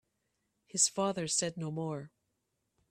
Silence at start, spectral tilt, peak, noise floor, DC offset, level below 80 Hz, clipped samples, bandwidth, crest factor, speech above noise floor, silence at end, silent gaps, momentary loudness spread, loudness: 0.75 s; -3 dB/octave; -14 dBFS; -82 dBFS; under 0.1%; -76 dBFS; under 0.1%; 14 kHz; 24 dB; 48 dB; 0.85 s; none; 11 LU; -32 LUFS